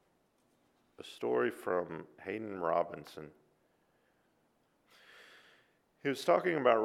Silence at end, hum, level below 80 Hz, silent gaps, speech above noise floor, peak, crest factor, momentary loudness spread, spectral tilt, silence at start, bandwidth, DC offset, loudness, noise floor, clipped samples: 0 s; none; -80 dBFS; none; 41 dB; -12 dBFS; 24 dB; 21 LU; -5.5 dB/octave; 1 s; 15.5 kHz; under 0.1%; -34 LUFS; -74 dBFS; under 0.1%